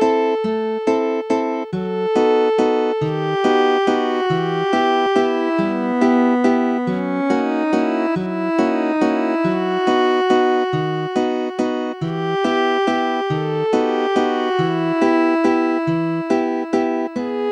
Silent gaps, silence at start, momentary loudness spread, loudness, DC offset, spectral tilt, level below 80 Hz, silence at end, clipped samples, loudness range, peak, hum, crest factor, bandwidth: none; 0 s; 5 LU; -18 LUFS; under 0.1%; -6.5 dB/octave; -60 dBFS; 0 s; under 0.1%; 2 LU; -2 dBFS; none; 16 dB; 9.6 kHz